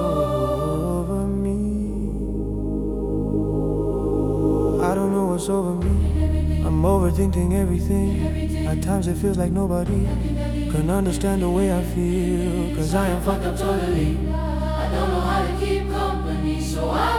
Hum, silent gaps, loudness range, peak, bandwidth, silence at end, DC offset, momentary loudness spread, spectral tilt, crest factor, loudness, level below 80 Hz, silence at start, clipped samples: none; none; 3 LU; -6 dBFS; 15.5 kHz; 0 s; under 0.1%; 4 LU; -7 dB/octave; 14 dB; -22 LUFS; -28 dBFS; 0 s; under 0.1%